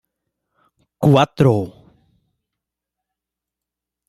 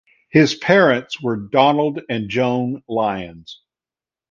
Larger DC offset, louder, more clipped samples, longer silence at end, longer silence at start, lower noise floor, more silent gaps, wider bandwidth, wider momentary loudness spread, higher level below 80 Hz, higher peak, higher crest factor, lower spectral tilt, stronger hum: neither; about the same, -16 LUFS vs -18 LUFS; neither; first, 2.4 s vs 0.75 s; first, 1 s vs 0.35 s; second, -85 dBFS vs under -90 dBFS; neither; first, 13 kHz vs 7.4 kHz; about the same, 9 LU vs 10 LU; about the same, -54 dBFS vs -56 dBFS; about the same, -2 dBFS vs 0 dBFS; about the same, 20 dB vs 18 dB; first, -7.5 dB/octave vs -6 dB/octave; first, 60 Hz at -50 dBFS vs none